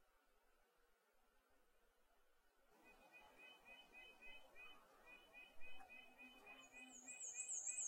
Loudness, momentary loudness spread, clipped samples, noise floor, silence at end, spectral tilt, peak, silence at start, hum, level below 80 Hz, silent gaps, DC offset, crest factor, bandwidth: -56 LUFS; 17 LU; under 0.1%; -79 dBFS; 0 s; 1 dB/octave; -36 dBFS; 0 s; none; -80 dBFS; none; under 0.1%; 22 dB; 16 kHz